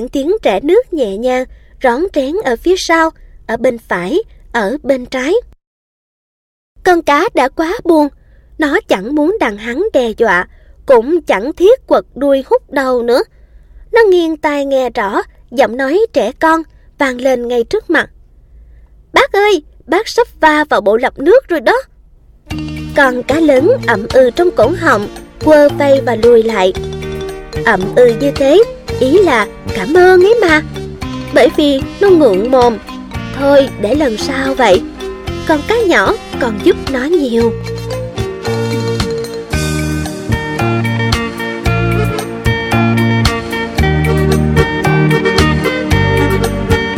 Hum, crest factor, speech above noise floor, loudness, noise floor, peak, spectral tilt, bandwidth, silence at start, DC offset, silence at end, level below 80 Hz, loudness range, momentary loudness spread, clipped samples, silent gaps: none; 12 dB; 32 dB; -12 LUFS; -43 dBFS; 0 dBFS; -6 dB/octave; 16.5 kHz; 0 s; under 0.1%; 0 s; -30 dBFS; 5 LU; 10 LU; under 0.1%; 5.67-6.76 s